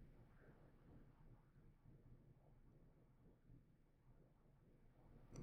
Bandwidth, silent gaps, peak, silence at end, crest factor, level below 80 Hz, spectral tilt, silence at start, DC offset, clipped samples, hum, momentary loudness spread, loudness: 3.6 kHz; none; -46 dBFS; 0 s; 22 dB; -72 dBFS; -7.5 dB/octave; 0 s; under 0.1%; under 0.1%; none; 3 LU; -69 LUFS